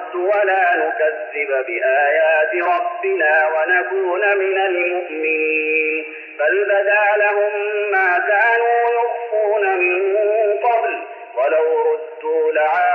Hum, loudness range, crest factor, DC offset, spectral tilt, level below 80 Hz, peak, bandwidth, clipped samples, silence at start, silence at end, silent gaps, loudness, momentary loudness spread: none; 2 LU; 14 dB; under 0.1%; -4 dB/octave; -80 dBFS; -4 dBFS; 4.7 kHz; under 0.1%; 0 s; 0 s; none; -17 LUFS; 6 LU